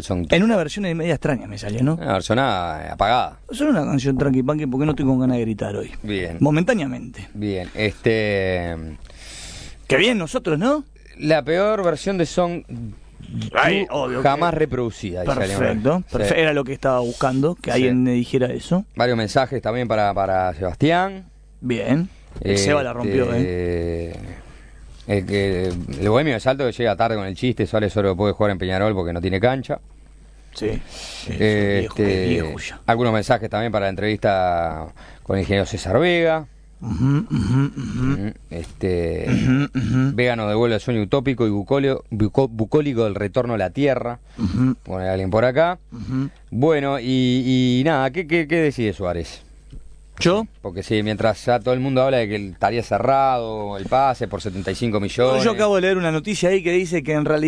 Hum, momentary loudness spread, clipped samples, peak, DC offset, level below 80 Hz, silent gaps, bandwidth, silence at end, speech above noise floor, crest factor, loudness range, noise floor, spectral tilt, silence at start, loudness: none; 10 LU; under 0.1%; 0 dBFS; under 0.1%; -40 dBFS; none; 11 kHz; 0 s; 25 dB; 20 dB; 3 LU; -45 dBFS; -6.5 dB/octave; 0 s; -20 LUFS